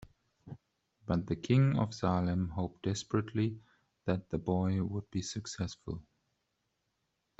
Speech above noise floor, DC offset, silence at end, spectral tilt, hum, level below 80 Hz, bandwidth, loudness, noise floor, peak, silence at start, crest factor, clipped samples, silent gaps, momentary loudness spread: 49 dB; under 0.1%; 1.4 s; -6.5 dB/octave; none; -60 dBFS; 8.2 kHz; -34 LUFS; -82 dBFS; -16 dBFS; 0.45 s; 20 dB; under 0.1%; none; 18 LU